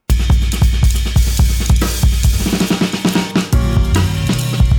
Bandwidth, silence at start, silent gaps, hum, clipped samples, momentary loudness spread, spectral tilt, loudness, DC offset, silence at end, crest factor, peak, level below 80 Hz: 20 kHz; 0.1 s; none; none; under 0.1%; 2 LU; -5 dB/octave; -15 LUFS; under 0.1%; 0 s; 12 dB; -2 dBFS; -16 dBFS